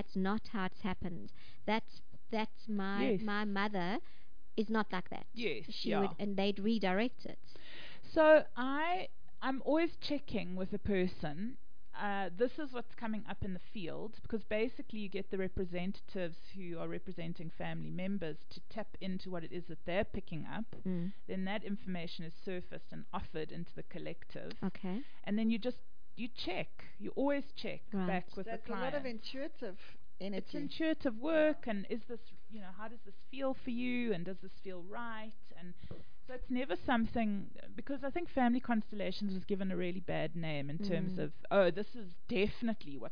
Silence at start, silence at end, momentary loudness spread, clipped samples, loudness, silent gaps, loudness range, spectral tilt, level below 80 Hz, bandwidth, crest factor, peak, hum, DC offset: 0 s; 0 s; 15 LU; under 0.1%; -38 LUFS; none; 9 LU; -4.5 dB/octave; -60 dBFS; 5.2 kHz; 24 dB; -14 dBFS; none; 2%